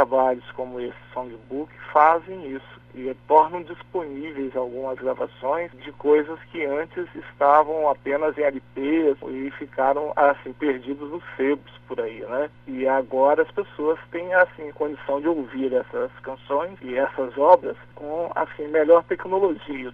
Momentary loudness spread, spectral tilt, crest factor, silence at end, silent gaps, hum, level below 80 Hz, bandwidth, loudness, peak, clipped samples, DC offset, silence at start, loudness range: 15 LU; -8 dB/octave; 22 dB; 0 s; none; 60 Hz at -55 dBFS; -60 dBFS; 4.6 kHz; -23 LUFS; 0 dBFS; under 0.1%; under 0.1%; 0 s; 4 LU